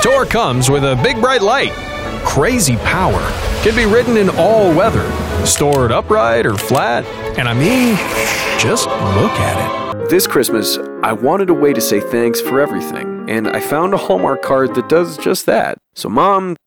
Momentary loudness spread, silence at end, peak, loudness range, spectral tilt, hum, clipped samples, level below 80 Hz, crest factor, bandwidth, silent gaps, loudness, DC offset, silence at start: 7 LU; 0.1 s; -2 dBFS; 3 LU; -4.5 dB/octave; none; under 0.1%; -32 dBFS; 10 dB; over 20 kHz; none; -14 LUFS; 0.2%; 0 s